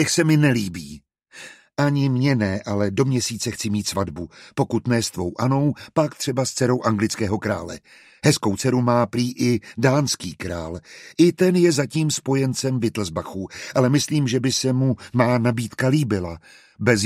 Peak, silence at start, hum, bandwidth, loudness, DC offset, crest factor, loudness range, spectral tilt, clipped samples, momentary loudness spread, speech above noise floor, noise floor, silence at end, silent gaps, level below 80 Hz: -2 dBFS; 0 s; none; 15 kHz; -21 LUFS; under 0.1%; 18 dB; 2 LU; -5.5 dB/octave; under 0.1%; 13 LU; 24 dB; -44 dBFS; 0 s; none; -52 dBFS